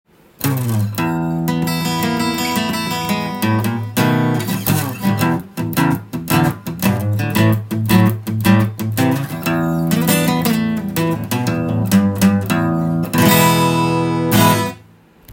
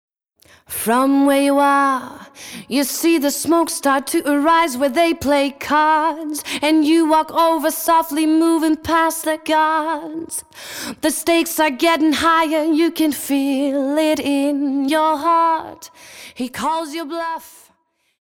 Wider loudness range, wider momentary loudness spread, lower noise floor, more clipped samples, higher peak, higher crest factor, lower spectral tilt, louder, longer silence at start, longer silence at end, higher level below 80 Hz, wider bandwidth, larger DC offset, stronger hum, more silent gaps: about the same, 3 LU vs 3 LU; second, 6 LU vs 13 LU; second, -46 dBFS vs -63 dBFS; neither; first, 0 dBFS vs -4 dBFS; about the same, 16 dB vs 12 dB; first, -5.5 dB/octave vs -2.5 dB/octave; about the same, -17 LUFS vs -17 LUFS; second, 0.4 s vs 0.7 s; second, 0 s vs 0.75 s; first, -48 dBFS vs -54 dBFS; about the same, 17 kHz vs 18 kHz; neither; neither; neither